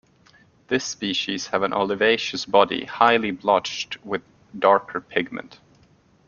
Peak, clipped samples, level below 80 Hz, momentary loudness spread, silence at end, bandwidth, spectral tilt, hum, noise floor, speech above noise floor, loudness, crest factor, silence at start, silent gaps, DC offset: -2 dBFS; under 0.1%; -64 dBFS; 11 LU; 0.75 s; 7.2 kHz; -3.5 dB/octave; none; -57 dBFS; 35 dB; -22 LUFS; 22 dB; 0.7 s; none; under 0.1%